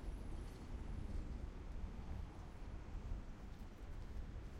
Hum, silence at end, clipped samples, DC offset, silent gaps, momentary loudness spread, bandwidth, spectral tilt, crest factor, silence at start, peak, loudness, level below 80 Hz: none; 0 s; under 0.1%; under 0.1%; none; 5 LU; 11.5 kHz; -7 dB/octave; 14 dB; 0 s; -34 dBFS; -52 LUFS; -50 dBFS